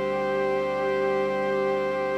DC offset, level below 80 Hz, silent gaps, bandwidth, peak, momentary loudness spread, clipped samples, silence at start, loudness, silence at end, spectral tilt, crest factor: under 0.1%; -56 dBFS; none; 9.2 kHz; -14 dBFS; 1 LU; under 0.1%; 0 s; -25 LUFS; 0 s; -6 dB/octave; 10 dB